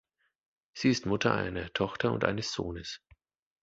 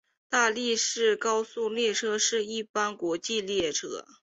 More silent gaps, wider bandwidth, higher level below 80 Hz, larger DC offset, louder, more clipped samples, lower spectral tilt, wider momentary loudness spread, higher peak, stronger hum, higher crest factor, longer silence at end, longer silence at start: second, none vs 2.70-2.74 s; about the same, 8 kHz vs 8.2 kHz; first, -54 dBFS vs -70 dBFS; neither; second, -31 LUFS vs -27 LUFS; neither; first, -5 dB/octave vs -1 dB/octave; first, 13 LU vs 6 LU; first, -8 dBFS vs -12 dBFS; neither; first, 26 dB vs 18 dB; first, 0.65 s vs 0.2 s; first, 0.75 s vs 0.3 s